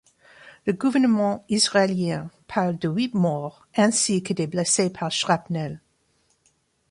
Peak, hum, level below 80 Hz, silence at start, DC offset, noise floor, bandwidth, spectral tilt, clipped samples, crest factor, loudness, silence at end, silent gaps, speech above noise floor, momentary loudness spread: -6 dBFS; none; -62 dBFS; 0.45 s; under 0.1%; -67 dBFS; 11.5 kHz; -4 dB/octave; under 0.1%; 18 dB; -23 LUFS; 1.15 s; none; 44 dB; 10 LU